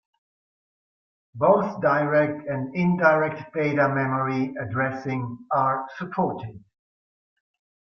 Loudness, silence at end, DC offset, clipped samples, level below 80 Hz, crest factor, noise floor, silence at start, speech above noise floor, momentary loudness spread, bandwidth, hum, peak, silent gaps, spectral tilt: -24 LUFS; 1.35 s; under 0.1%; under 0.1%; -64 dBFS; 20 dB; under -90 dBFS; 1.35 s; over 67 dB; 10 LU; 6.4 kHz; none; -4 dBFS; none; -9 dB/octave